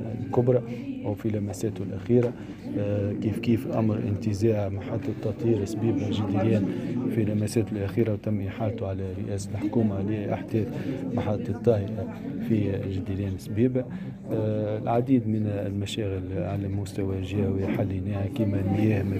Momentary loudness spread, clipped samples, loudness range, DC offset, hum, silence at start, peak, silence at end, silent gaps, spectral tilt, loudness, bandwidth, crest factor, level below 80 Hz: 7 LU; under 0.1%; 2 LU; under 0.1%; none; 0 s; -8 dBFS; 0 s; none; -8 dB/octave; -27 LUFS; 14.5 kHz; 18 dB; -56 dBFS